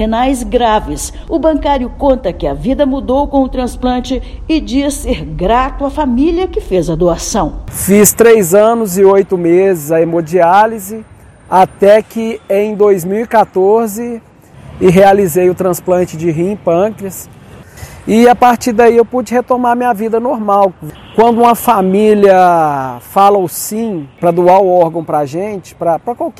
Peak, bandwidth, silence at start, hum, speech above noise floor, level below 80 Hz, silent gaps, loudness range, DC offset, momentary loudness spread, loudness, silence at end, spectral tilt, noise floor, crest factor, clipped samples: 0 dBFS; 17 kHz; 0 s; none; 23 dB; -30 dBFS; none; 5 LU; under 0.1%; 11 LU; -11 LUFS; 0.1 s; -5.5 dB/octave; -34 dBFS; 10 dB; 1%